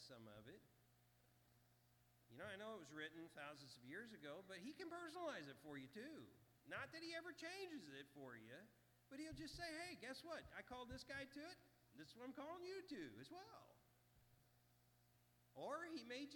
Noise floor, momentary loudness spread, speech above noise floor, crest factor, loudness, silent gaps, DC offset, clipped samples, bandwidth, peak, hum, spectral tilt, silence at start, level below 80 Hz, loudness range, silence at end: -78 dBFS; 11 LU; 22 dB; 20 dB; -56 LUFS; none; under 0.1%; under 0.1%; 19 kHz; -38 dBFS; 60 Hz at -80 dBFS; -4 dB/octave; 0 s; -80 dBFS; 4 LU; 0 s